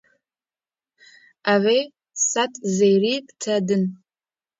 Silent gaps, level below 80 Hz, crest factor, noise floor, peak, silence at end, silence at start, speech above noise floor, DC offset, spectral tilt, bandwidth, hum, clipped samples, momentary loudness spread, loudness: none; -72 dBFS; 18 dB; under -90 dBFS; -6 dBFS; 0.65 s; 1.45 s; over 70 dB; under 0.1%; -4 dB/octave; 7.8 kHz; none; under 0.1%; 9 LU; -21 LUFS